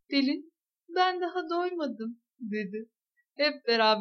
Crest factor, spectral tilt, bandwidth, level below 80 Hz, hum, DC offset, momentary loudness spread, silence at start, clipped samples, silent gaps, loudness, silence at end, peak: 18 dB; -5 dB/octave; 6.6 kHz; -90 dBFS; none; under 0.1%; 14 LU; 0.1 s; under 0.1%; none; -30 LUFS; 0 s; -12 dBFS